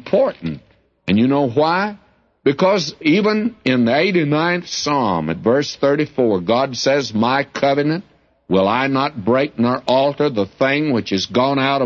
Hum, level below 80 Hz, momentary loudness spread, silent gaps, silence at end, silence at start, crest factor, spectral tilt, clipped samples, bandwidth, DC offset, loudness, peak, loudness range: none; -56 dBFS; 5 LU; none; 0 s; 0.05 s; 14 dB; -5.5 dB/octave; under 0.1%; 7.4 kHz; under 0.1%; -17 LUFS; -2 dBFS; 1 LU